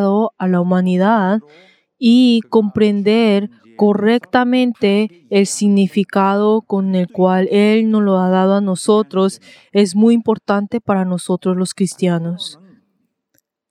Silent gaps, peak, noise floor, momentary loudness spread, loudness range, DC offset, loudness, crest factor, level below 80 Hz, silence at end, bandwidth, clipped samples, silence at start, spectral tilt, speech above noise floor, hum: none; 0 dBFS; -67 dBFS; 6 LU; 3 LU; under 0.1%; -15 LUFS; 14 dB; -64 dBFS; 1.15 s; 12 kHz; under 0.1%; 0 s; -6 dB/octave; 53 dB; none